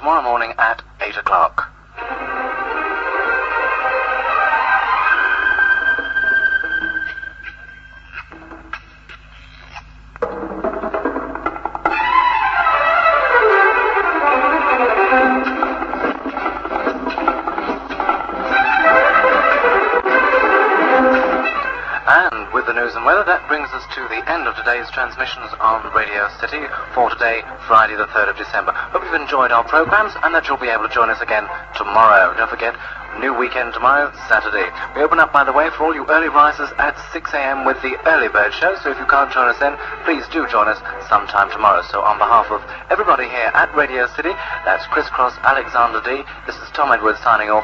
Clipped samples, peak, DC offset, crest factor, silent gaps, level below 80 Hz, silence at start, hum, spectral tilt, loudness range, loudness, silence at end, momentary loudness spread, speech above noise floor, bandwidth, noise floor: under 0.1%; 0 dBFS; under 0.1%; 16 dB; none; -44 dBFS; 0 s; none; -5 dB/octave; 6 LU; -16 LUFS; 0 s; 11 LU; 24 dB; 7.6 kHz; -40 dBFS